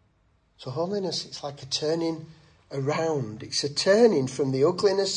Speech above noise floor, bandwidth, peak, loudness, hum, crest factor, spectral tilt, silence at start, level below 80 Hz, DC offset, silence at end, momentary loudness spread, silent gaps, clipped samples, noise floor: 40 dB; 11 kHz; -8 dBFS; -25 LUFS; none; 18 dB; -4.5 dB/octave; 0.6 s; -66 dBFS; under 0.1%; 0 s; 16 LU; none; under 0.1%; -66 dBFS